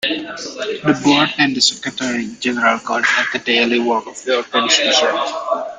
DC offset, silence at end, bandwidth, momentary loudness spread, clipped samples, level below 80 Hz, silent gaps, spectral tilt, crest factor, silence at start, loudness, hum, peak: under 0.1%; 0 s; 9.6 kHz; 8 LU; under 0.1%; -60 dBFS; none; -2.5 dB/octave; 18 dB; 0 s; -16 LUFS; none; 0 dBFS